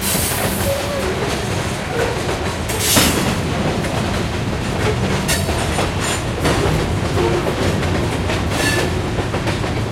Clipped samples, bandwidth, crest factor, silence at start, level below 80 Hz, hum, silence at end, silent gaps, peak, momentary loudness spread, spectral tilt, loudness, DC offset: under 0.1%; 16.5 kHz; 18 dB; 0 s; -30 dBFS; none; 0 s; none; -2 dBFS; 4 LU; -4 dB/octave; -18 LUFS; under 0.1%